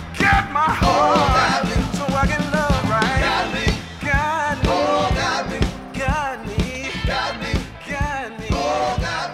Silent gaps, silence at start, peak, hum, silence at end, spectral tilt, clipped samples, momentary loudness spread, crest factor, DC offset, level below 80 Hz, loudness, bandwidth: none; 0 s; -4 dBFS; none; 0 s; -5 dB/octave; under 0.1%; 9 LU; 16 dB; under 0.1%; -30 dBFS; -20 LUFS; 15.5 kHz